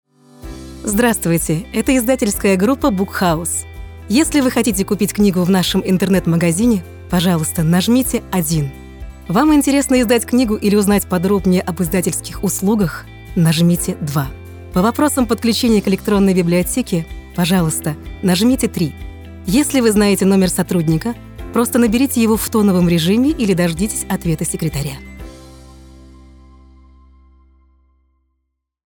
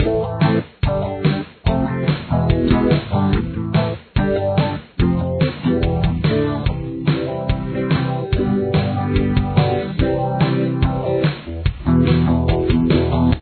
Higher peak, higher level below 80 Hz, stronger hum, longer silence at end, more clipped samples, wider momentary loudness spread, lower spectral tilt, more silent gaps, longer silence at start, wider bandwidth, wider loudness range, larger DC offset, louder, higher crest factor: about the same, -2 dBFS vs -2 dBFS; second, -36 dBFS vs -28 dBFS; neither; first, 3.35 s vs 0 s; neither; first, 11 LU vs 5 LU; second, -5 dB/octave vs -11 dB/octave; neither; first, 0.45 s vs 0 s; first, over 20 kHz vs 4.6 kHz; about the same, 3 LU vs 2 LU; neither; first, -16 LUFS vs -19 LUFS; about the same, 14 dB vs 14 dB